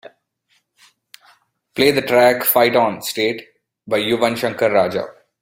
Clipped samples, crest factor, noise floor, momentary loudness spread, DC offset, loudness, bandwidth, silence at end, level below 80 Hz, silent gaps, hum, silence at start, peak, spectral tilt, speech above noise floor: under 0.1%; 18 dB; -65 dBFS; 11 LU; under 0.1%; -17 LUFS; 16.5 kHz; 0.3 s; -60 dBFS; none; none; 1.75 s; 0 dBFS; -4 dB/octave; 48 dB